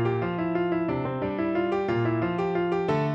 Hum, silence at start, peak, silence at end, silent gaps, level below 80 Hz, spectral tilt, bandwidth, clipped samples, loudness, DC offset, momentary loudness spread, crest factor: none; 0 s; -14 dBFS; 0 s; none; -54 dBFS; -9 dB/octave; 7.2 kHz; under 0.1%; -27 LUFS; under 0.1%; 3 LU; 12 dB